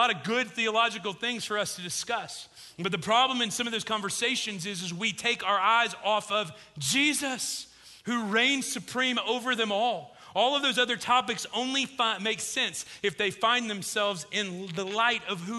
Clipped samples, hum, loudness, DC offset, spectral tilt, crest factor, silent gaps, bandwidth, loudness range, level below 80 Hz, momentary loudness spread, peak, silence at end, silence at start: under 0.1%; none; -27 LUFS; under 0.1%; -2 dB/octave; 20 dB; none; 12.5 kHz; 2 LU; -72 dBFS; 9 LU; -10 dBFS; 0 s; 0 s